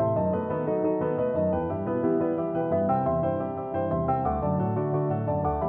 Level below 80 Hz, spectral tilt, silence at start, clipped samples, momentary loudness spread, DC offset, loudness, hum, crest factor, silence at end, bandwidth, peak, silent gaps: -46 dBFS; -13 dB/octave; 0 s; under 0.1%; 3 LU; under 0.1%; -27 LUFS; none; 12 dB; 0 s; 3.8 kHz; -14 dBFS; none